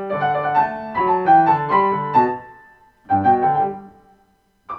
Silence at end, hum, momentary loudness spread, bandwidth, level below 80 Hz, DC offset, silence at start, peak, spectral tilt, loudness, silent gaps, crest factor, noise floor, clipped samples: 0 s; none; 8 LU; 5.6 kHz; -56 dBFS; under 0.1%; 0 s; -4 dBFS; -8.5 dB/octave; -18 LUFS; none; 16 dB; -60 dBFS; under 0.1%